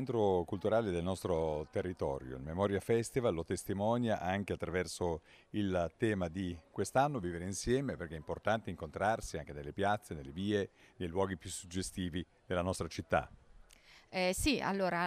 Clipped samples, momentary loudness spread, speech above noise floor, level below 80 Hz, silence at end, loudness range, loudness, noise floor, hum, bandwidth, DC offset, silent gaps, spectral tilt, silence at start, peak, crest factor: under 0.1%; 10 LU; 26 dB; -56 dBFS; 0 s; 3 LU; -36 LUFS; -61 dBFS; none; 15.5 kHz; under 0.1%; none; -5.5 dB/octave; 0 s; -16 dBFS; 20 dB